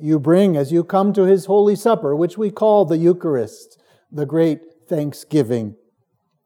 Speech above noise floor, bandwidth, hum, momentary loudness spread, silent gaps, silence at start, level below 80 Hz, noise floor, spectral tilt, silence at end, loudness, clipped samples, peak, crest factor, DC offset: 51 dB; 16.5 kHz; none; 11 LU; none; 0 s; -78 dBFS; -68 dBFS; -8 dB/octave; 0.7 s; -17 LUFS; under 0.1%; -4 dBFS; 14 dB; under 0.1%